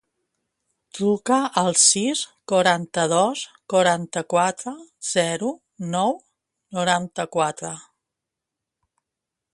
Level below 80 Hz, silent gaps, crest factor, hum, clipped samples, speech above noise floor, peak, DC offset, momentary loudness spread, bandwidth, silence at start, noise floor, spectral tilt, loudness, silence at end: -68 dBFS; none; 22 dB; none; under 0.1%; 63 dB; -2 dBFS; under 0.1%; 16 LU; 11.5 kHz; 0.95 s; -85 dBFS; -3 dB/octave; -21 LUFS; 1.7 s